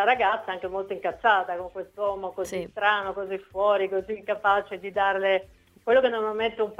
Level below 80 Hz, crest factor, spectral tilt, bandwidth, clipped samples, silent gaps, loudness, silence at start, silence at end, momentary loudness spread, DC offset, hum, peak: -60 dBFS; 18 dB; -4 dB/octave; 14 kHz; under 0.1%; none; -26 LUFS; 0 s; 0.05 s; 10 LU; under 0.1%; none; -6 dBFS